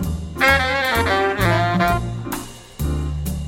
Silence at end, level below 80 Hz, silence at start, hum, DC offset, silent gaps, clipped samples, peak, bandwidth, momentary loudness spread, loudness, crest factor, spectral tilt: 0 s; -30 dBFS; 0 s; none; under 0.1%; none; under 0.1%; -2 dBFS; 16.5 kHz; 12 LU; -19 LUFS; 18 dB; -5 dB/octave